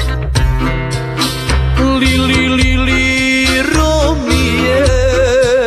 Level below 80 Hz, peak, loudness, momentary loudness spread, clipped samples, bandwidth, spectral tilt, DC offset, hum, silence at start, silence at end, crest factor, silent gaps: -18 dBFS; 0 dBFS; -12 LUFS; 5 LU; under 0.1%; 14 kHz; -5 dB/octave; under 0.1%; none; 0 s; 0 s; 12 dB; none